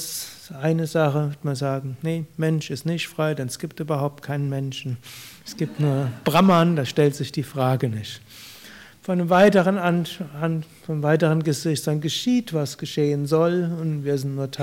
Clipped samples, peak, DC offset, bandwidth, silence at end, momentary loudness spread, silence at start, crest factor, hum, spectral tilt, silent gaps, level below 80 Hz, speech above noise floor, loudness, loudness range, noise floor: under 0.1%; -6 dBFS; under 0.1%; 16.5 kHz; 0 s; 14 LU; 0 s; 16 dB; none; -6 dB/octave; none; -62 dBFS; 23 dB; -23 LUFS; 5 LU; -45 dBFS